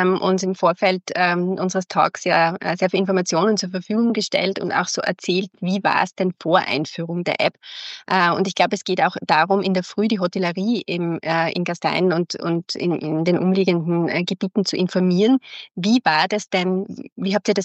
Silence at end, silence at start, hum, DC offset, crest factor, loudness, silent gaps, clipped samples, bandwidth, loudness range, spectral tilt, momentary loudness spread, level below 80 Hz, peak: 0 s; 0 s; none; under 0.1%; 18 dB; -20 LUFS; 17.12-17.16 s; under 0.1%; 8.4 kHz; 2 LU; -5 dB/octave; 6 LU; -74 dBFS; -2 dBFS